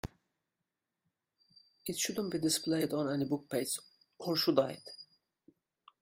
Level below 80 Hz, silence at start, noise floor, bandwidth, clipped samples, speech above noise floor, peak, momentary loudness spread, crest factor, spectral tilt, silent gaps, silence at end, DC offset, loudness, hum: -66 dBFS; 0.05 s; -88 dBFS; 16 kHz; under 0.1%; 55 dB; -14 dBFS; 16 LU; 24 dB; -4 dB/octave; none; 1 s; under 0.1%; -34 LUFS; none